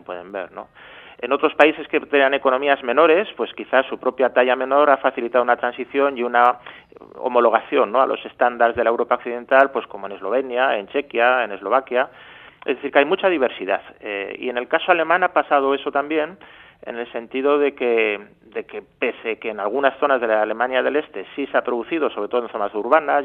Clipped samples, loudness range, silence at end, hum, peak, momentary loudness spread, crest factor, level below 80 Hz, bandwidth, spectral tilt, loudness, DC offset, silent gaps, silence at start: under 0.1%; 4 LU; 0 s; none; 0 dBFS; 13 LU; 20 dB; -64 dBFS; 4.3 kHz; -6 dB/octave; -19 LUFS; under 0.1%; none; 0.1 s